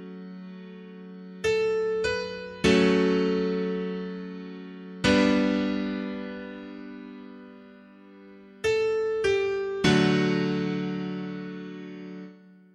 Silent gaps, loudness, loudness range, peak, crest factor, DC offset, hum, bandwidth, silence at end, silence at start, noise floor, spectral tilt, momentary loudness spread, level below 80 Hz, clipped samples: none; -26 LUFS; 6 LU; -8 dBFS; 20 dB; under 0.1%; none; 11.5 kHz; 0.4 s; 0 s; -50 dBFS; -6 dB/octave; 21 LU; -54 dBFS; under 0.1%